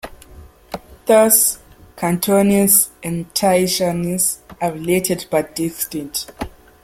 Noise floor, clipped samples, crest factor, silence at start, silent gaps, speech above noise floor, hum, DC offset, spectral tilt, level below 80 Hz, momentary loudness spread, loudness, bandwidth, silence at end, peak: -42 dBFS; under 0.1%; 18 dB; 0.05 s; none; 25 dB; none; under 0.1%; -4 dB/octave; -46 dBFS; 20 LU; -16 LUFS; 16.5 kHz; 0.35 s; 0 dBFS